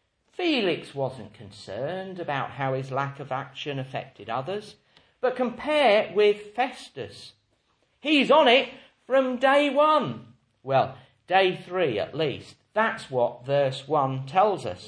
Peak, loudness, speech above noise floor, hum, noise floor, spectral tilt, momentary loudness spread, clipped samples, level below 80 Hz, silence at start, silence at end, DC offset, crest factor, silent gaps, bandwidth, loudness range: -6 dBFS; -25 LUFS; 44 dB; none; -69 dBFS; -5.5 dB/octave; 16 LU; under 0.1%; -70 dBFS; 0.4 s; 0 s; under 0.1%; 20 dB; none; 10.5 kHz; 9 LU